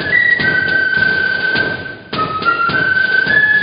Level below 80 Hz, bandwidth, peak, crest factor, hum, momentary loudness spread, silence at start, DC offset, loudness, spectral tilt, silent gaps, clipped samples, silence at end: -44 dBFS; 5.2 kHz; -2 dBFS; 12 dB; none; 9 LU; 0 s; under 0.1%; -13 LUFS; -9 dB/octave; none; under 0.1%; 0 s